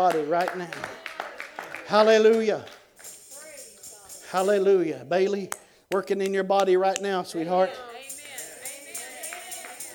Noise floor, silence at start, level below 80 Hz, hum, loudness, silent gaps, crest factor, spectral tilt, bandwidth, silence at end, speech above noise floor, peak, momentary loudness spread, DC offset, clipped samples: -47 dBFS; 0 s; -74 dBFS; none; -25 LUFS; none; 22 dB; -4 dB/octave; 19.5 kHz; 0 s; 24 dB; -4 dBFS; 21 LU; under 0.1%; under 0.1%